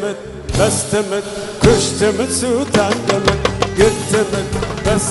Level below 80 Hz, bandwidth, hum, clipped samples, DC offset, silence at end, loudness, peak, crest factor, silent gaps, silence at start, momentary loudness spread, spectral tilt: -30 dBFS; 12 kHz; none; under 0.1%; under 0.1%; 0 s; -16 LUFS; 0 dBFS; 16 dB; none; 0 s; 8 LU; -4.5 dB/octave